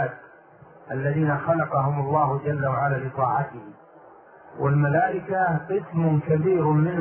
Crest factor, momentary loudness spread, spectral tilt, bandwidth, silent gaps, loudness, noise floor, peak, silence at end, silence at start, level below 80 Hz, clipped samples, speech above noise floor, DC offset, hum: 16 dB; 8 LU; -13 dB/octave; 3.2 kHz; none; -24 LUFS; -50 dBFS; -8 dBFS; 0 s; 0 s; -58 dBFS; under 0.1%; 27 dB; under 0.1%; none